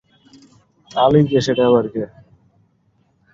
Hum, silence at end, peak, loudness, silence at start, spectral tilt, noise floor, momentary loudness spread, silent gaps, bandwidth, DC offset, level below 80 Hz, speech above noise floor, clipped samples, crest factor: none; 1.25 s; -2 dBFS; -16 LUFS; 0.95 s; -7 dB/octave; -61 dBFS; 14 LU; none; 7.8 kHz; under 0.1%; -52 dBFS; 46 dB; under 0.1%; 18 dB